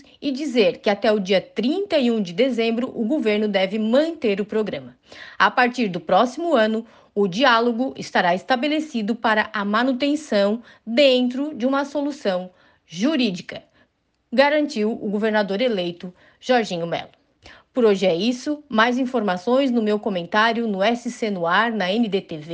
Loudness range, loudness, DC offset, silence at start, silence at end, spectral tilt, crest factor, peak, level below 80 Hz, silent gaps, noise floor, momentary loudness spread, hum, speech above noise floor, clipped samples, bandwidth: 3 LU; -21 LUFS; under 0.1%; 0.2 s; 0 s; -5 dB/octave; 18 dB; -4 dBFS; -66 dBFS; none; -66 dBFS; 9 LU; none; 45 dB; under 0.1%; 9.2 kHz